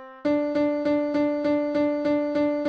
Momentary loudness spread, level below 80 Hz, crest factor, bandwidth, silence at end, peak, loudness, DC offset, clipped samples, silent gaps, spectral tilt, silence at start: 1 LU; -60 dBFS; 10 dB; 6.2 kHz; 0 s; -14 dBFS; -24 LUFS; under 0.1%; under 0.1%; none; -7 dB/octave; 0 s